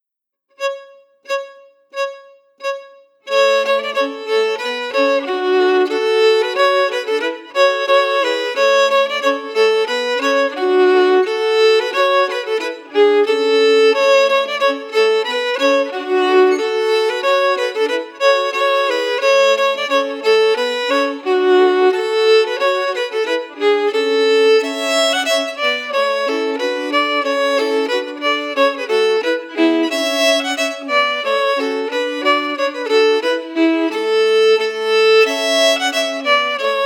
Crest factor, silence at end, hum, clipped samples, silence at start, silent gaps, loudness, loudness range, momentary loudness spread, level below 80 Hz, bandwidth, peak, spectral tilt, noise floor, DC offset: 16 dB; 0 s; none; under 0.1%; 0.6 s; none; -15 LUFS; 3 LU; 7 LU; under -90 dBFS; 17 kHz; 0 dBFS; -0.5 dB/octave; -80 dBFS; under 0.1%